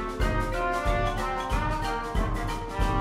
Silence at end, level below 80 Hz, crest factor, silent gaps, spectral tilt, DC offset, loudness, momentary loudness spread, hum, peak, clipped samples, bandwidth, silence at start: 0 s; -32 dBFS; 14 dB; none; -5.5 dB/octave; under 0.1%; -29 LUFS; 3 LU; none; -12 dBFS; under 0.1%; 15 kHz; 0 s